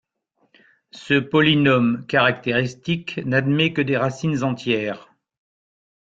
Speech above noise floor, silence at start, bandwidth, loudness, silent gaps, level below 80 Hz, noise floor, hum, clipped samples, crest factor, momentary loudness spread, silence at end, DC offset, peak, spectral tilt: 48 dB; 0.95 s; 7.8 kHz; -20 LUFS; none; -58 dBFS; -68 dBFS; none; under 0.1%; 18 dB; 9 LU; 1.05 s; under 0.1%; -4 dBFS; -6.5 dB/octave